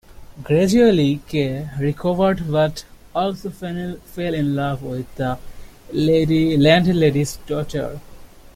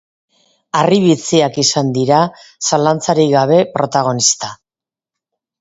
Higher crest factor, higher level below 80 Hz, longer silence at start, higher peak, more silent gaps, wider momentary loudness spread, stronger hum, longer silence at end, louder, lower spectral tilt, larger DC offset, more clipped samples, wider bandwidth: about the same, 18 dB vs 14 dB; first, -42 dBFS vs -56 dBFS; second, 0.1 s vs 0.75 s; about the same, -2 dBFS vs 0 dBFS; neither; first, 15 LU vs 8 LU; neither; second, 0.3 s vs 1.05 s; second, -19 LUFS vs -14 LUFS; first, -6.5 dB/octave vs -4 dB/octave; neither; neither; first, 16 kHz vs 8 kHz